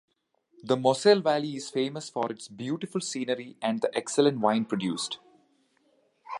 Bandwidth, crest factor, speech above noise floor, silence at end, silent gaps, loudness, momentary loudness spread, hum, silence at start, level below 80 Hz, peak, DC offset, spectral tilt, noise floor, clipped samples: 11.5 kHz; 20 dB; 41 dB; 0 s; none; -28 LUFS; 12 LU; none; 0.65 s; -76 dBFS; -8 dBFS; under 0.1%; -4.5 dB/octave; -68 dBFS; under 0.1%